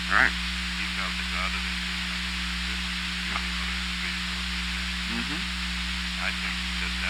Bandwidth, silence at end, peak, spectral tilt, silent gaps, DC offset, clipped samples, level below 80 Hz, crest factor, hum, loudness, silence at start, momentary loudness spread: 19 kHz; 0 s; -6 dBFS; -2.5 dB/octave; none; under 0.1%; under 0.1%; -36 dBFS; 22 dB; 60 Hz at -40 dBFS; -28 LUFS; 0 s; 2 LU